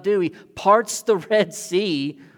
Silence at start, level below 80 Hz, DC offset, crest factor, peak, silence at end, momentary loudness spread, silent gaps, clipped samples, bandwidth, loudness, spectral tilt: 0.05 s; -66 dBFS; under 0.1%; 18 dB; -4 dBFS; 0.25 s; 7 LU; none; under 0.1%; 18 kHz; -21 LUFS; -4 dB/octave